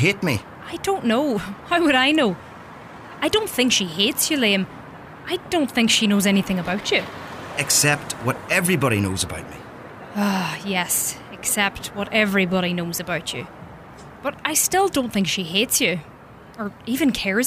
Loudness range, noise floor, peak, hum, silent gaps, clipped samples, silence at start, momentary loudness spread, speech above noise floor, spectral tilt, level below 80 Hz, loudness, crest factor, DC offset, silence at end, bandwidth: 3 LU; -41 dBFS; -4 dBFS; none; none; under 0.1%; 0 s; 18 LU; 20 dB; -3 dB/octave; -52 dBFS; -20 LUFS; 18 dB; under 0.1%; 0 s; 16 kHz